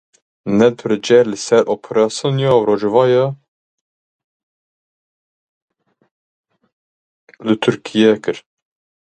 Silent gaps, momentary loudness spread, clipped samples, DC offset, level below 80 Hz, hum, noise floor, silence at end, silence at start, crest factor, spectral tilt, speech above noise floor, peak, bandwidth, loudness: 3.48-5.68 s, 6.11-6.44 s, 6.72-7.27 s; 10 LU; under 0.1%; under 0.1%; -60 dBFS; none; under -90 dBFS; 0.6 s; 0.45 s; 18 dB; -5.5 dB/octave; over 76 dB; 0 dBFS; 9.2 kHz; -15 LUFS